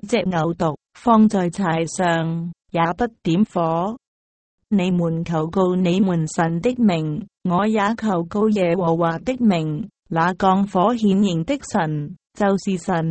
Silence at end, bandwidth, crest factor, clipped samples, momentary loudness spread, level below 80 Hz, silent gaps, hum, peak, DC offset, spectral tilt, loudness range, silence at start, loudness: 0 s; 8.8 kHz; 16 dB; under 0.1%; 7 LU; -52 dBFS; 4.07-4.58 s, 9.99-10.03 s; none; -4 dBFS; under 0.1%; -6.5 dB/octave; 3 LU; 0 s; -20 LUFS